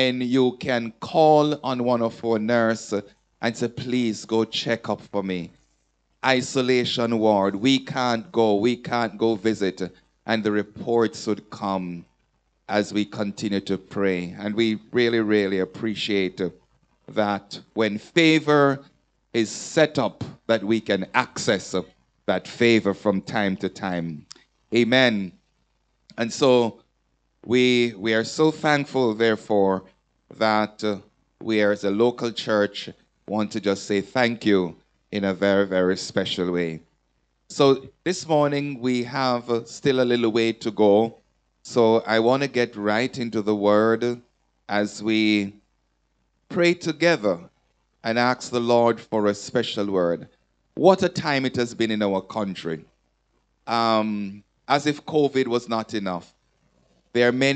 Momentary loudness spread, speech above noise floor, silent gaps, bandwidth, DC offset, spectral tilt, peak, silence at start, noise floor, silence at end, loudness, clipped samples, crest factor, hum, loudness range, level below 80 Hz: 11 LU; 48 dB; none; 9.2 kHz; under 0.1%; -5 dB/octave; -2 dBFS; 0 s; -70 dBFS; 0 s; -23 LUFS; under 0.1%; 22 dB; none; 4 LU; -66 dBFS